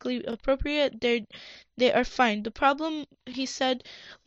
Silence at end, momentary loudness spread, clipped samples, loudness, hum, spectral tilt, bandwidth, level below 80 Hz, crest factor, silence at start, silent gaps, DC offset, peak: 0.15 s; 16 LU; under 0.1%; -27 LUFS; none; -4 dB/octave; 8 kHz; -48 dBFS; 18 dB; 0.05 s; none; under 0.1%; -10 dBFS